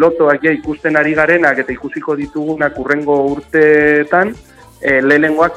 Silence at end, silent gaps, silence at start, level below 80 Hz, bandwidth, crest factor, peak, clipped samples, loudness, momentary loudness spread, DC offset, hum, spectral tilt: 0 s; none; 0 s; -44 dBFS; 10.5 kHz; 12 dB; 0 dBFS; under 0.1%; -13 LUFS; 9 LU; under 0.1%; none; -7 dB/octave